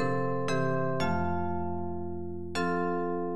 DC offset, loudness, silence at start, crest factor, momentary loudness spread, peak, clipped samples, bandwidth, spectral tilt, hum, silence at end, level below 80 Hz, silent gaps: 2%; -31 LUFS; 0 s; 14 dB; 7 LU; -16 dBFS; under 0.1%; 12 kHz; -7 dB/octave; none; 0 s; -54 dBFS; none